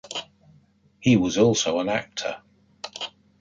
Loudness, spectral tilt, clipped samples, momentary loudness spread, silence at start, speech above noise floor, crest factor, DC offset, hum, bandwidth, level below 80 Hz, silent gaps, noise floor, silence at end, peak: -24 LUFS; -4.5 dB/octave; under 0.1%; 17 LU; 0.05 s; 37 dB; 18 dB; under 0.1%; none; 9.2 kHz; -58 dBFS; none; -59 dBFS; 0.35 s; -6 dBFS